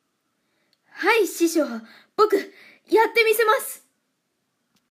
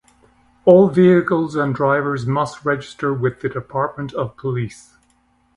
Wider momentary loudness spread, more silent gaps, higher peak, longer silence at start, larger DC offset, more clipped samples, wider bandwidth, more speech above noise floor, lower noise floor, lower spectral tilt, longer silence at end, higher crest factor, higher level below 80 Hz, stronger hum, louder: first, 16 LU vs 13 LU; neither; second, -6 dBFS vs 0 dBFS; first, 0.95 s vs 0.65 s; neither; neither; first, 15.5 kHz vs 11 kHz; first, 53 dB vs 43 dB; first, -74 dBFS vs -60 dBFS; second, -1.5 dB/octave vs -8 dB/octave; first, 1.15 s vs 0.8 s; about the same, 18 dB vs 18 dB; second, -80 dBFS vs -54 dBFS; neither; about the same, -20 LUFS vs -18 LUFS